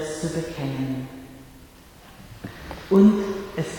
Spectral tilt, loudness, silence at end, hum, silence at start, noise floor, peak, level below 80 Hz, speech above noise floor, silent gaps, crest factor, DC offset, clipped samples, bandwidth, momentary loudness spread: -7 dB/octave; -22 LUFS; 0 s; none; 0 s; -48 dBFS; -6 dBFS; -48 dBFS; 27 dB; none; 18 dB; under 0.1%; under 0.1%; 18.5 kHz; 24 LU